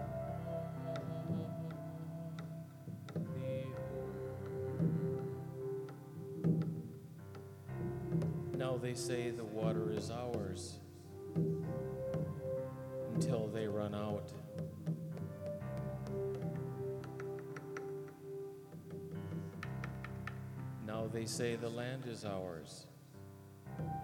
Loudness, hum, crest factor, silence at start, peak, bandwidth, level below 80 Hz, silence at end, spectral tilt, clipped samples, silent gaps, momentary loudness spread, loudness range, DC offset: -42 LUFS; none; 20 dB; 0 s; -22 dBFS; 16.5 kHz; -66 dBFS; 0 s; -7 dB/octave; under 0.1%; none; 12 LU; 5 LU; under 0.1%